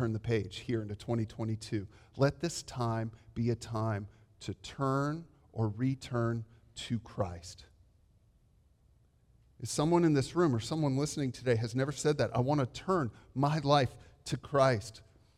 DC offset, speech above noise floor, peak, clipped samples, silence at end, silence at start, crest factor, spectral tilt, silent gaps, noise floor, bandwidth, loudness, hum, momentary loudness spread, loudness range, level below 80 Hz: under 0.1%; 34 dB; -12 dBFS; under 0.1%; 0.35 s; 0 s; 20 dB; -6 dB/octave; none; -67 dBFS; 13.5 kHz; -33 LUFS; none; 15 LU; 7 LU; -60 dBFS